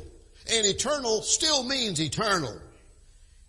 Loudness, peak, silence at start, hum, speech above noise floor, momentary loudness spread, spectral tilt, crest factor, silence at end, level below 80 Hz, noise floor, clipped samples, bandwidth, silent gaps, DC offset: -25 LUFS; -8 dBFS; 0 s; none; 27 dB; 11 LU; -2 dB/octave; 20 dB; 0.25 s; -52 dBFS; -54 dBFS; under 0.1%; 11.5 kHz; none; under 0.1%